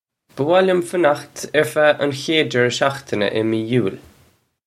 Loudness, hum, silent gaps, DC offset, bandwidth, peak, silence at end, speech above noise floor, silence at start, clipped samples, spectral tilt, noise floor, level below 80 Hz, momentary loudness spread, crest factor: -18 LUFS; none; none; under 0.1%; 15 kHz; 0 dBFS; 0.7 s; 39 dB; 0.35 s; under 0.1%; -5 dB/octave; -57 dBFS; -62 dBFS; 6 LU; 18 dB